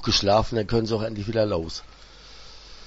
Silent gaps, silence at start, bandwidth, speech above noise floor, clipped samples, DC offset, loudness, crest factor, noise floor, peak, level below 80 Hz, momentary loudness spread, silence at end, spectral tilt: none; 0 s; 8 kHz; 20 dB; under 0.1%; under 0.1%; -24 LUFS; 18 dB; -44 dBFS; -8 dBFS; -40 dBFS; 24 LU; 0 s; -5 dB/octave